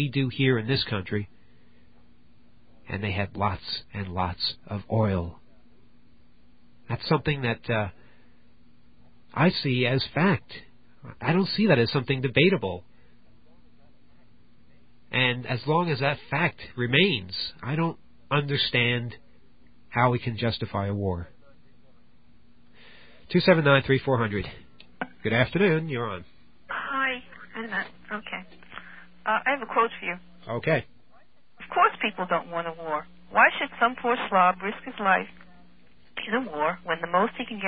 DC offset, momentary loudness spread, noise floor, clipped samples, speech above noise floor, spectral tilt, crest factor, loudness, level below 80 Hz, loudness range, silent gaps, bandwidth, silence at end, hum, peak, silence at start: 0.4%; 15 LU; -62 dBFS; under 0.1%; 37 dB; -10.5 dB/octave; 24 dB; -26 LUFS; -52 dBFS; 7 LU; none; 5 kHz; 0 s; none; -4 dBFS; 0 s